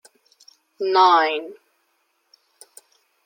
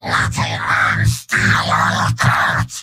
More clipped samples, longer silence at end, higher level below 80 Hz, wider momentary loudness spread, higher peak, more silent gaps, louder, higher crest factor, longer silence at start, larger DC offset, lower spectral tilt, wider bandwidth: neither; first, 1.7 s vs 0 s; second, under -90 dBFS vs -36 dBFS; first, 16 LU vs 3 LU; about the same, -4 dBFS vs -2 dBFS; neither; second, -18 LUFS vs -15 LUFS; first, 20 dB vs 14 dB; first, 0.8 s vs 0.05 s; neither; second, -2 dB/octave vs -4 dB/octave; about the same, 16.5 kHz vs 16 kHz